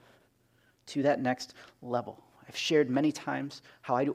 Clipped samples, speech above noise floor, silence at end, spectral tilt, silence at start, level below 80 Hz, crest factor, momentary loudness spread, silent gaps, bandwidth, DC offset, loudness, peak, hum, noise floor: under 0.1%; 37 dB; 0 s; -5 dB/octave; 0.85 s; -78 dBFS; 18 dB; 17 LU; none; 14.5 kHz; under 0.1%; -31 LUFS; -14 dBFS; none; -68 dBFS